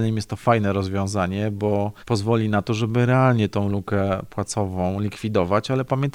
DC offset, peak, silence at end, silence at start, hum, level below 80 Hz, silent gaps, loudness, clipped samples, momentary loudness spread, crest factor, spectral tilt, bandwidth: under 0.1%; -4 dBFS; 0.05 s; 0 s; none; -50 dBFS; none; -22 LUFS; under 0.1%; 6 LU; 18 dB; -7 dB/octave; 12.5 kHz